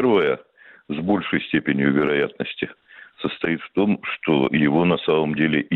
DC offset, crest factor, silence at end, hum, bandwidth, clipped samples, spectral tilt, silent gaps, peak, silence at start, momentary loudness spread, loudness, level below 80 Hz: under 0.1%; 14 dB; 0 s; none; 4.3 kHz; under 0.1%; -9 dB/octave; none; -8 dBFS; 0 s; 11 LU; -21 LUFS; -56 dBFS